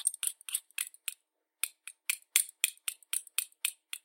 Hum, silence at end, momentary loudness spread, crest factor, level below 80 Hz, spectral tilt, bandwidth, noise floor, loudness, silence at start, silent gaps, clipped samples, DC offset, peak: none; 0.05 s; 10 LU; 34 dB; under -90 dBFS; 10.5 dB/octave; 17 kHz; -74 dBFS; -34 LUFS; 0 s; none; under 0.1%; under 0.1%; -2 dBFS